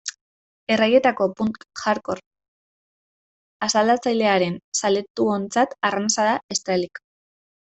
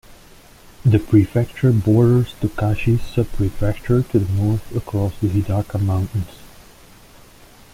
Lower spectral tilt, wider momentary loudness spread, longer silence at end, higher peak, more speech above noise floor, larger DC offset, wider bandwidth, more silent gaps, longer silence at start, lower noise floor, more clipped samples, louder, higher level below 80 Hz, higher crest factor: second, -3.5 dB/octave vs -8.5 dB/octave; about the same, 11 LU vs 9 LU; second, 0.8 s vs 1.3 s; about the same, -4 dBFS vs -2 dBFS; first, over 69 dB vs 28 dB; neither; second, 8.4 kHz vs 15.5 kHz; first, 0.21-0.67 s, 2.26-2.31 s, 2.48-3.60 s, 4.64-4.72 s, 5.10-5.15 s, 6.43-6.49 s vs none; about the same, 0.05 s vs 0.1 s; first, under -90 dBFS vs -45 dBFS; neither; about the same, -21 LUFS vs -19 LUFS; second, -66 dBFS vs -36 dBFS; about the same, 18 dB vs 16 dB